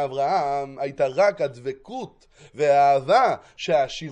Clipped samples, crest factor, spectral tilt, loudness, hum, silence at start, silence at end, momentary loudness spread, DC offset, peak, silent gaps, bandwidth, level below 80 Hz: under 0.1%; 16 dB; -5 dB/octave; -22 LUFS; none; 0 s; 0 s; 16 LU; under 0.1%; -6 dBFS; none; 9.2 kHz; -62 dBFS